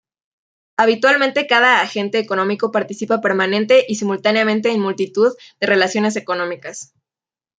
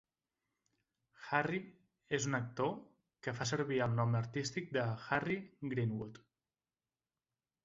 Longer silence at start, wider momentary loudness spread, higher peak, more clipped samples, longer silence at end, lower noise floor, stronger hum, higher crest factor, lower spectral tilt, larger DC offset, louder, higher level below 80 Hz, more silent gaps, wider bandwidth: second, 0.8 s vs 1.2 s; about the same, 9 LU vs 10 LU; first, 0 dBFS vs -16 dBFS; neither; second, 0.75 s vs 1.45 s; about the same, under -90 dBFS vs under -90 dBFS; neither; second, 18 dB vs 24 dB; about the same, -4 dB/octave vs -5 dB/octave; neither; first, -16 LUFS vs -38 LUFS; about the same, -68 dBFS vs -70 dBFS; neither; first, 9.4 kHz vs 7.6 kHz